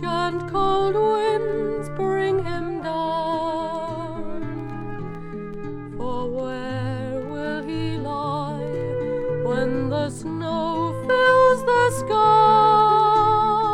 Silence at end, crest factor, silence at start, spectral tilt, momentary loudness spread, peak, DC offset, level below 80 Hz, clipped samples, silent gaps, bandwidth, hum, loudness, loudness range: 0 s; 14 dB; 0 s; -6 dB/octave; 16 LU; -6 dBFS; under 0.1%; -44 dBFS; under 0.1%; none; 14 kHz; none; -22 LUFS; 12 LU